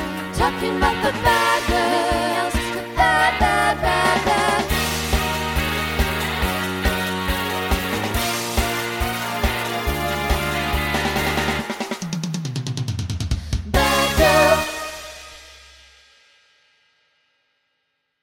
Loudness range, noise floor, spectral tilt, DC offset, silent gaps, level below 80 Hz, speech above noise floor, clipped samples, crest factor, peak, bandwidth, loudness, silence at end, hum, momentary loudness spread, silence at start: 4 LU; -73 dBFS; -4 dB/octave; under 0.1%; none; -30 dBFS; 54 dB; under 0.1%; 20 dB; -2 dBFS; 17.5 kHz; -20 LUFS; 2.65 s; none; 10 LU; 0 s